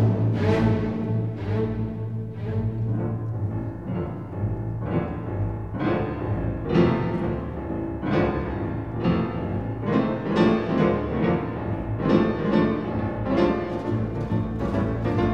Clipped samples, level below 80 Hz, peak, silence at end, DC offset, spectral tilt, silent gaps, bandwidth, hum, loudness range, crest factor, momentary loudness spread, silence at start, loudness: under 0.1%; -40 dBFS; -6 dBFS; 0 s; 0.3%; -9.5 dB/octave; none; 6.6 kHz; none; 5 LU; 18 dB; 8 LU; 0 s; -25 LUFS